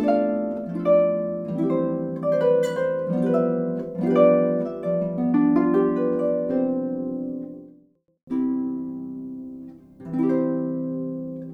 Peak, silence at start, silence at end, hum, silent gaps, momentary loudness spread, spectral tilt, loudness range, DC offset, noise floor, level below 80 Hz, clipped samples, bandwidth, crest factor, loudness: -4 dBFS; 0 s; 0 s; none; 8.23-8.27 s; 15 LU; -9 dB/octave; 8 LU; under 0.1%; -57 dBFS; -64 dBFS; under 0.1%; 8.6 kHz; 18 dB; -23 LUFS